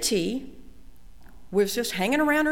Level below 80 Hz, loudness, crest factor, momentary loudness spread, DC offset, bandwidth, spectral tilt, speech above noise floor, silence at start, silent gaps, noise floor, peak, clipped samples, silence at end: -50 dBFS; -25 LUFS; 14 dB; 12 LU; 0.7%; 17.5 kHz; -3.5 dB/octave; 26 dB; 0 s; none; -50 dBFS; -12 dBFS; under 0.1%; 0 s